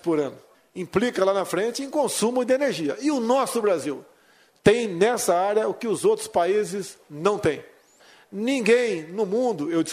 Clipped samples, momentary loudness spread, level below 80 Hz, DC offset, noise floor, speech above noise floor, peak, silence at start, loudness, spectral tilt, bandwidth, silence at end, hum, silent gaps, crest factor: under 0.1%; 10 LU; -60 dBFS; under 0.1%; -58 dBFS; 35 dB; -2 dBFS; 0.05 s; -23 LUFS; -4.5 dB/octave; 15.5 kHz; 0 s; none; none; 20 dB